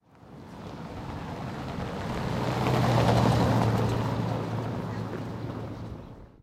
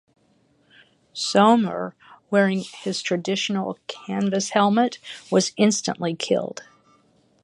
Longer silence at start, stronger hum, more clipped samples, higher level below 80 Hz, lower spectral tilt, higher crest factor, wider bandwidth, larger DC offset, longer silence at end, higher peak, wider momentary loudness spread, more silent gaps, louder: second, 0.2 s vs 1.15 s; neither; neither; first, -44 dBFS vs -70 dBFS; first, -7 dB/octave vs -4.5 dB/octave; about the same, 20 dB vs 20 dB; first, 15 kHz vs 11.5 kHz; neither; second, 0.15 s vs 0.8 s; second, -8 dBFS vs -4 dBFS; first, 18 LU vs 15 LU; neither; second, -28 LUFS vs -22 LUFS